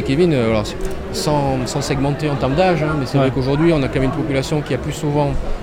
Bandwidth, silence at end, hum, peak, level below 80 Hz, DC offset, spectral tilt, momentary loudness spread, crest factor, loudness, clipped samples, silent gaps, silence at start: 16 kHz; 0 s; none; -4 dBFS; -30 dBFS; under 0.1%; -6.5 dB/octave; 6 LU; 14 dB; -18 LUFS; under 0.1%; none; 0 s